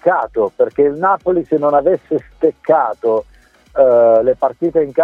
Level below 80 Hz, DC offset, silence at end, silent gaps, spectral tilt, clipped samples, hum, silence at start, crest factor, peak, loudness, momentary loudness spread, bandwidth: -50 dBFS; under 0.1%; 0 s; none; -9 dB/octave; under 0.1%; none; 0.05 s; 14 dB; 0 dBFS; -15 LUFS; 8 LU; 4.1 kHz